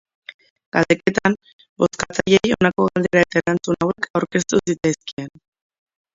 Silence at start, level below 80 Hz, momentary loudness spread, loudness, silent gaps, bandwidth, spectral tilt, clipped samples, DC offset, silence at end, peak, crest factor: 0.75 s; -52 dBFS; 8 LU; -19 LUFS; 1.53-1.59 s, 1.69-1.76 s, 4.10-4.14 s, 5.13-5.17 s; 7.8 kHz; -5 dB/octave; under 0.1%; under 0.1%; 0.85 s; 0 dBFS; 20 dB